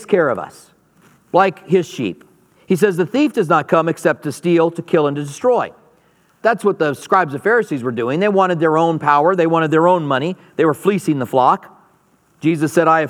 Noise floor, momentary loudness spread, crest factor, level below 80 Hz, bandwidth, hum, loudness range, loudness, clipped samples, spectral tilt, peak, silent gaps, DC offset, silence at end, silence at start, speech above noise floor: -56 dBFS; 7 LU; 16 dB; -68 dBFS; 16 kHz; none; 3 LU; -16 LUFS; under 0.1%; -6.5 dB/octave; 0 dBFS; none; under 0.1%; 0 s; 0 s; 41 dB